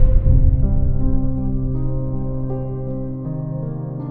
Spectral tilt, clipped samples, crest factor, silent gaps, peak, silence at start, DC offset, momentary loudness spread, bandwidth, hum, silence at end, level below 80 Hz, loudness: -15 dB/octave; under 0.1%; 14 dB; none; -2 dBFS; 0 s; under 0.1%; 10 LU; 1.7 kHz; none; 0 s; -18 dBFS; -22 LUFS